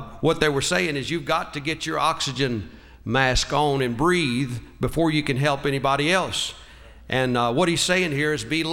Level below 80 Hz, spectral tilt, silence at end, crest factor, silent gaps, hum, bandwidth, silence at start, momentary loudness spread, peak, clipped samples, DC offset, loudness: -42 dBFS; -4.5 dB/octave; 0 s; 20 dB; none; none; 16.5 kHz; 0 s; 7 LU; -2 dBFS; under 0.1%; under 0.1%; -22 LUFS